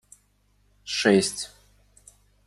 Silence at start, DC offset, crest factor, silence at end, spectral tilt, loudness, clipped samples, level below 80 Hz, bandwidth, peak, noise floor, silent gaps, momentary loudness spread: 0.85 s; under 0.1%; 24 dB; 1 s; -3.5 dB/octave; -23 LUFS; under 0.1%; -62 dBFS; 13 kHz; -4 dBFS; -65 dBFS; none; 18 LU